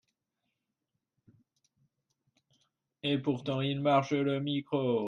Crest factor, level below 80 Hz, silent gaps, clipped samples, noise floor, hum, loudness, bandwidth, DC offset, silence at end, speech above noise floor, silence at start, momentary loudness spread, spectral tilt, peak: 20 dB; -74 dBFS; none; under 0.1%; -86 dBFS; none; -31 LUFS; 7 kHz; under 0.1%; 0 s; 56 dB; 3.05 s; 6 LU; -7 dB/octave; -14 dBFS